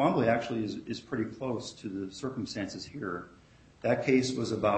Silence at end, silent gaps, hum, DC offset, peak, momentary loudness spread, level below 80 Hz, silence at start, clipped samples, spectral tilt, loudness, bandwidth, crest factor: 0 s; none; none; under 0.1%; -12 dBFS; 12 LU; -64 dBFS; 0 s; under 0.1%; -5.5 dB/octave; -32 LUFS; 8.4 kHz; 20 dB